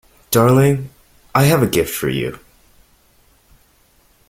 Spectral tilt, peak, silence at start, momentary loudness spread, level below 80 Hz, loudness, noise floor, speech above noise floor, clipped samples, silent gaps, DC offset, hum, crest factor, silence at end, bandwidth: -5.5 dB/octave; -2 dBFS; 0.3 s; 11 LU; -46 dBFS; -16 LUFS; -55 dBFS; 40 dB; under 0.1%; none; under 0.1%; none; 18 dB; 1.9 s; 16.5 kHz